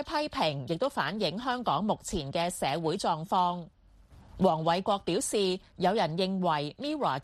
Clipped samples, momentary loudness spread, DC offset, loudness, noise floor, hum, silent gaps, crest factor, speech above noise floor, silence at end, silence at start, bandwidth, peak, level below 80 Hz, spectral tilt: under 0.1%; 4 LU; under 0.1%; -30 LUFS; -56 dBFS; none; none; 18 dB; 26 dB; 0 s; 0 s; 14 kHz; -12 dBFS; -56 dBFS; -4.5 dB/octave